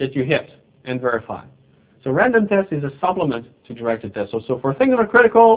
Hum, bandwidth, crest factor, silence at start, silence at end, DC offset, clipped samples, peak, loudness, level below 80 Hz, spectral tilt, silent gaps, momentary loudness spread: none; 4 kHz; 18 dB; 0 s; 0 s; under 0.1%; under 0.1%; 0 dBFS; -19 LUFS; -54 dBFS; -10.5 dB/octave; none; 16 LU